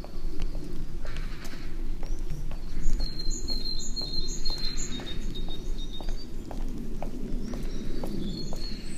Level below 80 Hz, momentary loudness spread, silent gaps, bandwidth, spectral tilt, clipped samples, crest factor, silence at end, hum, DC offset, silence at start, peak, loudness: -30 dBFS; 8 LU; none; 8.4 kHz; -4 dB/octave; under 0.1%; 16 dB; 0 s; none; under 0.1%; 0 s; -8 dBFS; -36 LUFS